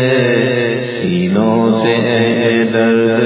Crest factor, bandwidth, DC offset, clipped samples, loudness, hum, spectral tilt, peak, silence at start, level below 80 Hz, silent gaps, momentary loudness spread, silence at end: 12 dB; 4 kHz; under 0.1%; under 0.1%; -13 LUFS; none; -10.5 dB/octave; 0 dBFS; 0 s; -50 dBFS; none; 4 LU; 0 s